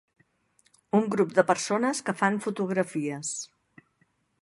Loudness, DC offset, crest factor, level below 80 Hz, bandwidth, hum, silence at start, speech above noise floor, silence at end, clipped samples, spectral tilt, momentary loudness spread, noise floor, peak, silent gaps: -27 LUFS; under 0.1%; 24 dB; -76 dBFS; 11.5 kHz; none; 0.95 s; 44 dB; 0.95 s; under 0.1%; -4.5 dB/octave; 9 LU; -70 dBFS; -4 dBFS; none